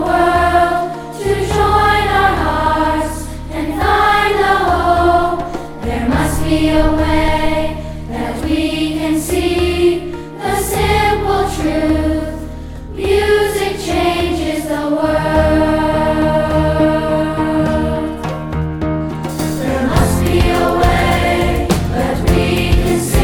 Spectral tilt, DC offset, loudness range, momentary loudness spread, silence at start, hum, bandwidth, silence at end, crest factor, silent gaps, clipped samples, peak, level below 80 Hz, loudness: -5.5 dB/octave; 0.1%; 3 LU; 10 LU; 0 s; none; 17.5 kHz; 0 s; 12 dB; none; under 0.1%; -2 dBFS; -24 dBFS; -15 LUFS